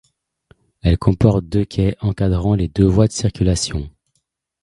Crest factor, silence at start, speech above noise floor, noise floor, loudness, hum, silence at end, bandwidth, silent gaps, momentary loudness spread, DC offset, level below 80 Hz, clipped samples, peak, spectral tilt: 18 dB; 0.85 s; 54 dB; -70 dBFS; -18 LUFS; none; 0.75 s; 11.5 kHz; none; 7 LU; under 0.1%; -30 dBFS; under 0.1%; 0 dBFS; -6.5 dB/octave